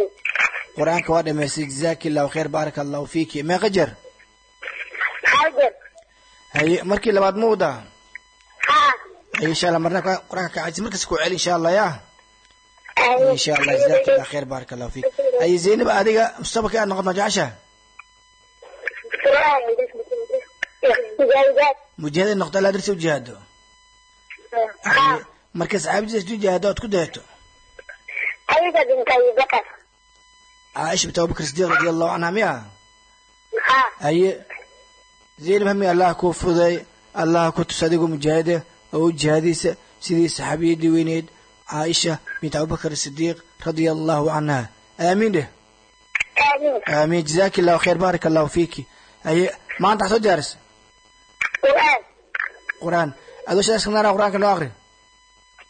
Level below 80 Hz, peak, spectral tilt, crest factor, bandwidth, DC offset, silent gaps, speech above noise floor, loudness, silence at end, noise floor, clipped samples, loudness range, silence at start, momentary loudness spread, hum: -50 dBFS; -4 dBFS; -4.5 dB/octave; 16 dB; 9.4 kHz; under 0.1%; none; 36 dB; -20 LUFS; 0.95 s; -55 dBFS; under 0.1%; 4 LU; 0 s; 12 LU; none